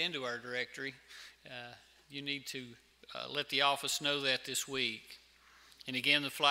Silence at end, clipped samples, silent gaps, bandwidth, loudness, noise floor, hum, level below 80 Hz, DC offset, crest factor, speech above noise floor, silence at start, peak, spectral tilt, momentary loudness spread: 0 s; under 0.1%; none; 16 kHz; -34 LUFS; -63 dBFS; none; -76 dBFS; under 0.1%; 26 dB; 26 dB; 0 s; -12 dBFS; -1.5 dB/octave; 22 LU